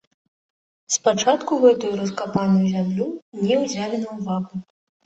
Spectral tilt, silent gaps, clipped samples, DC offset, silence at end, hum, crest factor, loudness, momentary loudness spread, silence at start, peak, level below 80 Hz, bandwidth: -5 dB/octave; 3.22-3.32 s; under 0.1%; under 0.1%; 0.45 s; none; 18 dB; -21 LUFS; 10 LU; 0.9 s; -2 dBFS; -62 dBFS; 8.2 kHz